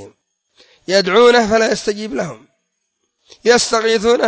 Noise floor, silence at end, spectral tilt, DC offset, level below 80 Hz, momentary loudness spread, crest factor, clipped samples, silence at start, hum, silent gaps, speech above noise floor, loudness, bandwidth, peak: -70 dBFS; 0 s; -3 dB/octave; under 0.1%; -50 dBFS; 13 LU; 16 dB; under 0.1%; 0 s; none; none; 57 dB; -14 LUFS; 8 kHz; 0 dBFS